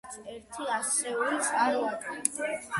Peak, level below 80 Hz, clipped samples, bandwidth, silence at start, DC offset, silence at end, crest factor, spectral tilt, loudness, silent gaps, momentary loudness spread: -8 dBFS; -70 dBFS; under 0.1%; 12 kHz; 0.05 s; under 0.1%; 0 s; 24 dB; -1.5 dB/octave; -29 LUFS; none; 14 LU